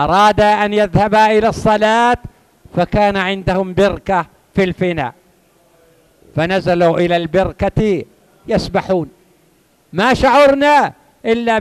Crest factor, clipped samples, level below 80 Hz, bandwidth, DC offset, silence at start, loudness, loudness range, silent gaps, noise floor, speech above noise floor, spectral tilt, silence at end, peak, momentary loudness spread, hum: 14 dB; under 0.1%; -36 dBFS; 14 kHz; under 0.1%; 0 s; -14 LUFS; 5 LU; none; -54 dBFS; 41 dB; -6 dB/octave; 0 s; 0 dBFS; 11 LU; none